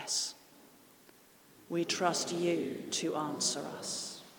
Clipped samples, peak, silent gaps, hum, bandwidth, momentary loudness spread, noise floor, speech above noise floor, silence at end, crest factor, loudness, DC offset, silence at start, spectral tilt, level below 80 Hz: under 0.1%; -16 dBFS; none; none; 19 kHz; 8 LU; -61 dBFS; 27 dB; 0 s; 20 dB; -34 LUFS; under 0.1%; 0 s; -2.5 dB/octave; -82 dBFS